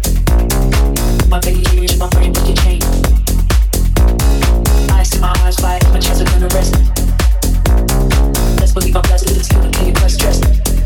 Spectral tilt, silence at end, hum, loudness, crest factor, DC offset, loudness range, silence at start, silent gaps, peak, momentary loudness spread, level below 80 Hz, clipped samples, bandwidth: -5 dB/octave; 0 s; none; -13 LUFS; 10 dB; under 0.1%; 1 LU; 0 s; none; 0 dBFS; 2 LU; -12 dBFS; under 0.1%; 18 kHz